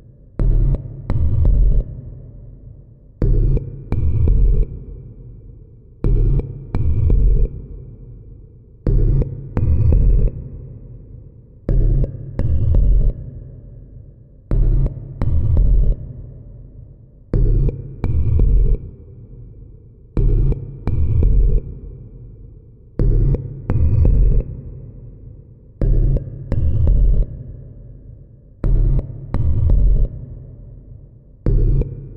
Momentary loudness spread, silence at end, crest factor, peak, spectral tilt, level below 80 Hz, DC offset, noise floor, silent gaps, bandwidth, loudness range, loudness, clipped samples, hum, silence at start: 23 LU; 0 s; 14 dB; -4 dBFS; -12 dB/octave; -18 dBFS; under 0.1%; -42 dBFS; none; 2.5 kHz; 1 LU; -20 LUFS; under 0.1%; none; 0.4 s